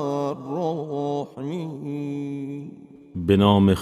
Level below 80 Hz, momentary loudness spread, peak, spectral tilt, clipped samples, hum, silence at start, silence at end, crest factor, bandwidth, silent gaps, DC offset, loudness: -44 dBFS; 16 LU; -4 dBFS; -8 dB/octave; under 0.1%; none; 0 s; 0 s; 18 dB; 13 kHz; none; under 0.1%; -24 LUFS